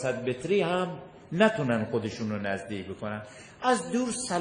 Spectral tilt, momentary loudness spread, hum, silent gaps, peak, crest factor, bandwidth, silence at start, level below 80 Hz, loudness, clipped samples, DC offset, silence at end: -5 dB/octave; 12 LU; none; none; -8 dBFS; 20 dB; 10.5 kHz; 0 s; -64 dBFS; -29 LUFS; under 0.1%; under 0.1%; 0 s